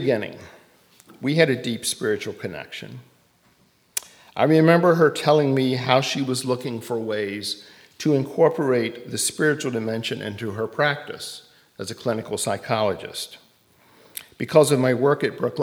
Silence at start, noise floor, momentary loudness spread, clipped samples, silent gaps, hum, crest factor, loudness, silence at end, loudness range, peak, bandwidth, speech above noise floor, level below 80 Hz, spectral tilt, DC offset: 0 s; -60 dBFS; 17 LU; under 0.1%; none; none; 22 dB; -22 LUFS; 0 s; 7 LU; 0 dBFS; over 20 kHz; 38 dB; -68 dBFS; -5 dB/octave; under 0.1%